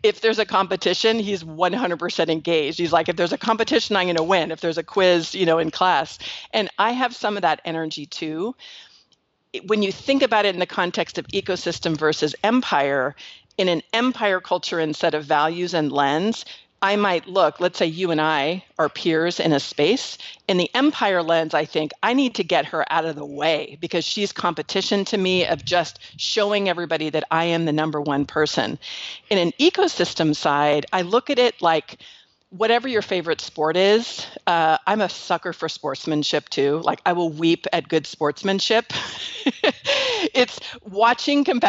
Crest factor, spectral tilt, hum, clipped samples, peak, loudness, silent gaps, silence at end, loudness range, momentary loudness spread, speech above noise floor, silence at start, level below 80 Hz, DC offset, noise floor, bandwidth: 16 dB; -4.5 dB/octave; none; under 0.1%; -6 dBFS; -21 LUFS; none; 0 s; 2 LU; 8 LU; 44 dB; 0.05 s; -64 dBFS; under 0.1%; -65 dBFS; 8 kHz